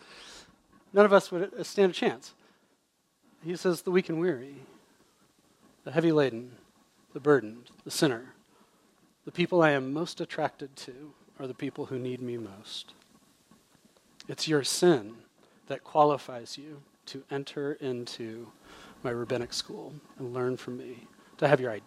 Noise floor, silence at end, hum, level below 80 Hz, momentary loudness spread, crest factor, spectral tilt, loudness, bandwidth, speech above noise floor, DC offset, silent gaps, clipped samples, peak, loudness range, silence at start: -72 dBFS; 0.05 s; none; -74 dBFS; 23 LU; 26 dB; -5 dB/octave; -29 LUFS; 14.5 kHz; 43 dB; under 0.1%; none; under 0.1%; -6 dBFS; 9 LU; 0.1 s